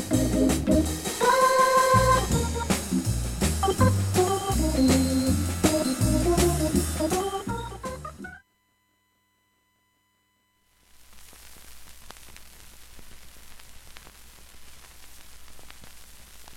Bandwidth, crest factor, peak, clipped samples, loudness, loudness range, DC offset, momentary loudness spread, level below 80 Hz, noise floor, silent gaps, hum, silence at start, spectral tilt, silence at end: 17 kHz; 20 dB; -8 dBFS; under 0.1%; -24 LUFS; 13 LU; under 0.1%; 17 LU; -36 dBFS; -70 dBFS; none; none; 0 s; -5 dB/octave; 0 s